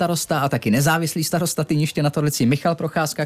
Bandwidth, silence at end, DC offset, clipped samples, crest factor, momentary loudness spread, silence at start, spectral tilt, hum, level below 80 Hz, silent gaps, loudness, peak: 15.5 kHz; 0 s; under 0.1%; under 0.1%; 12 dB; 3 LU; 0 s; -5 dB/octave; none; -54 dBFS; none; -20 LUFS; -8 dBFS